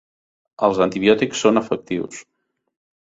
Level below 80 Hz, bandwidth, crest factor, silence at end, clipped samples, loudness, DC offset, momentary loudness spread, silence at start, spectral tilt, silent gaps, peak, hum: -58 dBFS; 8 kHz; 20 dB; 0.85 s; under 0.1%; -19 LUFS; under 0.1%; 11 LU; 0.6 s; -4.5 dB/octave; none; -2 dBFS; none